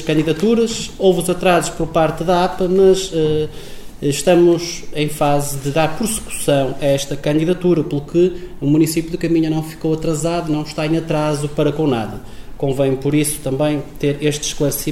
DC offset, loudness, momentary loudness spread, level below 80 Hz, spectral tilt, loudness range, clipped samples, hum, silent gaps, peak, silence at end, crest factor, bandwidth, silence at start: under 0.1%; -17 LUFS; 7 LU; -36 dBFS; -5.5 dB/octave; 3 LU; under 0.1%; none; none; -2 dBFS; 0 s; 14 dB; 16.5 kHz; 0 s